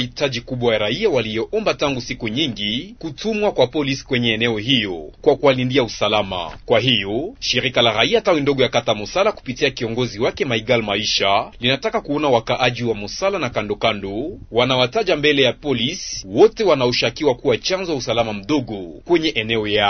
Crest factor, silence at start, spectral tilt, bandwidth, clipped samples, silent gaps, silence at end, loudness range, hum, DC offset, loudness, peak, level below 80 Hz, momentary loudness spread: 18 dB; 0 s; -4.5 dB/octave; 6.6 kHz; under 0.1%; none; 0 s; 3 LU; none; under 0.1%; -19 LUFS; 0 dBFS; -44 dBFS; 8 LU